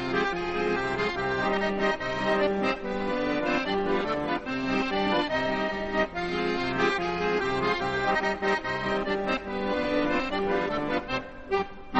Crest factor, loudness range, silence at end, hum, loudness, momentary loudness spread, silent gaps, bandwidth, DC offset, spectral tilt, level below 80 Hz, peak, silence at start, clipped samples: 16 dB; 1 LU; 0 s; none; -27 LUFS; 4 LU; none; 8.4 kHz; under 0.1%; -5.5 dB/octave; -48 dBFS; -10 dBFS; 0 s; under 0.1%